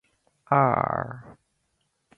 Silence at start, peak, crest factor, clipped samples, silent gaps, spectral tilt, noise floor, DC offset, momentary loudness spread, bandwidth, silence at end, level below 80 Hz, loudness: 0.5 s; -6 dBFS; 22 dB; under 0.1%; none; -10 dB/octave; -74 dBFS; under 0.1%; 17 LU; 4.3 kHz; 0.85 s; -58 dBFS; -24 LUFS